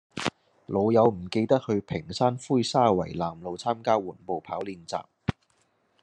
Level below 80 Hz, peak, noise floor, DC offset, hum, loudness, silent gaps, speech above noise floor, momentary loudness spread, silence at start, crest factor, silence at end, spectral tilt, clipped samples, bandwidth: -60 dBFS; -6 dBFS; -69 dBFS; under 0.1%; none; -27 LUFS; none; 43 dB; 12 LU; 0.15 s; 20 dB; 0.7 s; -6 dB/octave; under 0.1%; 11 kHz